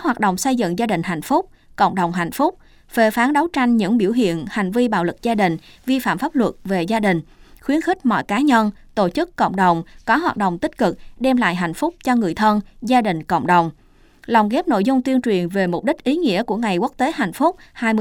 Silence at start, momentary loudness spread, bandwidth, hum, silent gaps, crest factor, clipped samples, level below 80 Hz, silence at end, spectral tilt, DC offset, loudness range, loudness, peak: 0 s; 6 LU; 18.5 kHz; none; none; 16 dB; under 0.1%; -50 dBFS; 0 s; -5.5 dB/octave; under 0.1%; 1 LU; -19 LUFS; -2 dBFS